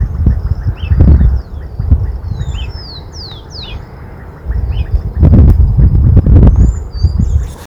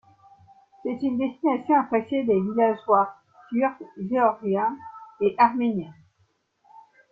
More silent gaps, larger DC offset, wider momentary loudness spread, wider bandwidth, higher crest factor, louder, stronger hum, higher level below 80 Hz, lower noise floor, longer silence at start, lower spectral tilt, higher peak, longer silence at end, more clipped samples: neither; neither; first, 19 LU vs 12 LU; first, 7.6 kHz vs 5 kHz; second, 10 dB vs 20 dB; first, -11 LUFS vs -24 LUFS; neither; first, -12 dBFS vs -68 dBFS; second, -28 dBFS vs -68 dBFS; second, 0 s vs 0.85 s; about the same, -8.5 dB/octave vs -9.5 dB/octave; first, 0 dBFS vs -6 dBFS; second, 0 s vs 1.2 s; first, 2% vs under 0.1%